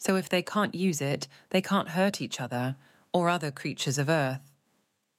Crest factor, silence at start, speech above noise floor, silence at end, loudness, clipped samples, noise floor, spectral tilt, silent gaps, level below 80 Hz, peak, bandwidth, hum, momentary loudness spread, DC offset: 18 dB; 0 s; 45 dB; 0.8 s; -29 LUFS; under 0.1%; -74 dBFS; -5 dB/octave; none; -76 dBFS; -12 dBFS; 16 kHz; none; 8 LU; under 0.1%